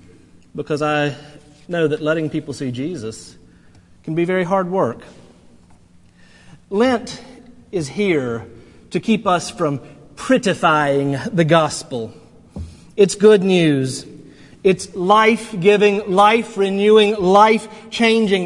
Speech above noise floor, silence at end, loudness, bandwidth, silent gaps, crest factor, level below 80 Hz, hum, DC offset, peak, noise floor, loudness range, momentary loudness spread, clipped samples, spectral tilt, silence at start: 32 dB; 0 s; -17 LUFS; 11.5 kHz; none; 18 dB; -54 dBFS; none; under 0.1%; 0 dBFS; -48 dBFS; 10 LU; 18 LU; under 0.1%; -5.5 dB/octave; 0.55 s